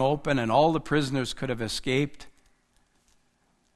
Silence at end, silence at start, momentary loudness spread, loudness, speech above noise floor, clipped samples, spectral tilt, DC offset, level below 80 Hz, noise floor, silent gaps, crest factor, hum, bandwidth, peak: 1.45 s; 0 s; 9 LU; -26 LUFS; 43 dB; under 0.1%; -5.5 dB/octave; under 0.1%; -50 dBFS; -68 dBFS; none; 20 dB; none; 12.5 kHz; -8 dBFS